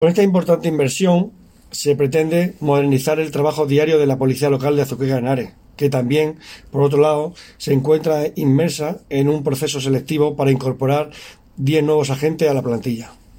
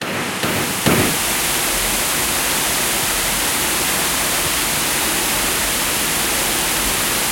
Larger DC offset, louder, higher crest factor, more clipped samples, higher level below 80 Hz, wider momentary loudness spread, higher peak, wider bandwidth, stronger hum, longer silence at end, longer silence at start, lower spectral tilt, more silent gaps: neither; about the same, -18 LUFS vs -16 LUFS; about the same, 14 dB vs 18 dB; neither; second, -52 dBFS vs -38 dBFS; first, 8 LU vs 1 LU; about the same, -2 dBFS vs 0 dBFS; about the same, 16.5 kHz vs 17 kHz; neither; first, 0.25 s vs 0 s; about the same, 0 s vs 0 s; first, -6.5 dB/octave vs -1.5 dB/octave; neither